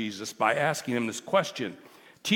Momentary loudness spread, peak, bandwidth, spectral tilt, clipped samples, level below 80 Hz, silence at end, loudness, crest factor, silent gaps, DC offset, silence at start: 11 LU; -8 dBFS; 18 kHz; -4 dB/octave; under 0.1%; -76 dBFS; 0 s; -28 LUFS; 20 dB; none; under 0.1%; 0 s